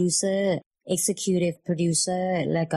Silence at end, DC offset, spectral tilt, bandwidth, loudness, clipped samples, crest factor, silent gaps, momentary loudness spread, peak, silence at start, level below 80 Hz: 0 s; under 0.1%; -4.5 dB/octave; 13.5 kHz; -25 LUFS; under 0.1%; 12 dB; 0.66-0.71 s; 4 LU; -12 dBFS; 0 s; -64 dBFS